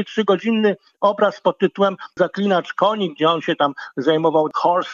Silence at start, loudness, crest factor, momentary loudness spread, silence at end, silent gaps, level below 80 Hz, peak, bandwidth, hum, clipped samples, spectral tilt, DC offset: 0 s; -19 LUFS; 16 dB; 4 LU; 0 s; none; -74 dBFS; -2 dBFS; 7.4 kHz; none; under 0.1%; -6.5 dB/octave; under 0.1%